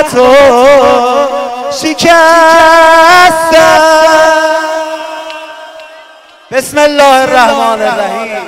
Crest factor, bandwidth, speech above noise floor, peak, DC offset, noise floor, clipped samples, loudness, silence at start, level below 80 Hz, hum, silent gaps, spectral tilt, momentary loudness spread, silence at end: 6 dB; 16.5 kHz; 31 dB; 0 dBFS; under 0.1%; -36 dBFS; 2%; -5 LUFS; 0 s; -40 dBFS; none; none; -2.5 dB/octave; 13 LU; 0 s